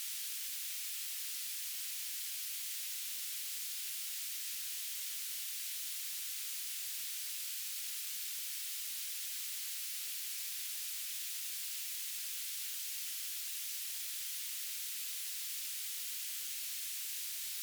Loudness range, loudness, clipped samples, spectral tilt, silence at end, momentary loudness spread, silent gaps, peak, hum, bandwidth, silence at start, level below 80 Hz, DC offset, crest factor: 0 LU; -38 LUFS; under 0.1%; 10 dB/octave; 0 s; 0 LU; none; -28 dBFS; none; over 20 kHz; 0 s; under -90 dBFS; under 0.1%; 14 dB